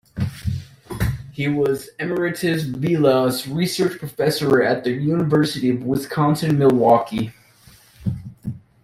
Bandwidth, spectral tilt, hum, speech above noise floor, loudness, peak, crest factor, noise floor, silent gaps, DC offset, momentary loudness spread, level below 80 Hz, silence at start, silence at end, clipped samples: 16 kHz; -6.5 dB/octave; none; 31 dB; -20 LUFS; -2 dBFS; 18 dB; -50 dBFS; none; under 0.1%; 12 LU; -44 dBFS; 0.15 s; 0.25 s; under 0.1%